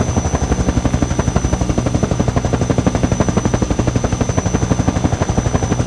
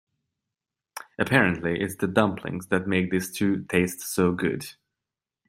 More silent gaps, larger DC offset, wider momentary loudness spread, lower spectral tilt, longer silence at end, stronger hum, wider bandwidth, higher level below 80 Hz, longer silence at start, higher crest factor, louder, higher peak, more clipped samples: neither; first, 0.3% vs under 0.1%; second, 2 LU vs 14 LU; about the same, -6 dB/octave vs -5.5 dB/octave; second, 0 s vs 0.75 s; neither; second, 11 kHz vs 16 kHz; first, -24 dBFS vs -60 dBFS; second, 0 s vs 0.95 s; second, 16 dB vs 24 dB; first, -17 LUFS vs -25 LUFS; about the same, 0 dBFS vs -2 dBFS; neither